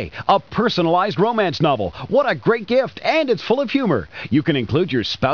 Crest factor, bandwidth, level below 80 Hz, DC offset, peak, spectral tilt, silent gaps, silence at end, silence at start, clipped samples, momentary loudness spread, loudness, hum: 16 dB; 5.4 kHz; -48 dBFS; 0.3%; -2 dBFS; -7 dB/octave; none; 0 s; 0 s; under 0.1%; 3 LU; -19 LUFS; none